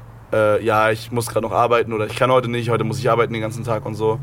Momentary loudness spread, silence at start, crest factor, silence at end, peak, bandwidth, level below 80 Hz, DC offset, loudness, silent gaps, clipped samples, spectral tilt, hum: 7 LU; 0 s; 16 dB; 0 s; -2 dBFS; 17 kHz; -48 dBFS; under 0.1%; -19 LUFS; none; under 0.1%; -6 dB/octave; none